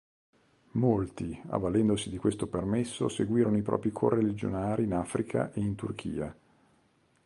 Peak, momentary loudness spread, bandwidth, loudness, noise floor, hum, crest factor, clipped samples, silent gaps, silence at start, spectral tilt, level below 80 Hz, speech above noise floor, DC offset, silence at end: -10 dBFS; 9 LU; 11.5 kHz; -30 LUFS; -68 dBFS; none; 20 dB; under 0.1%; none; 0.75 s; -7 dB/octave; -54 dBFS; 39 dB; under 0.1%; 0.9 s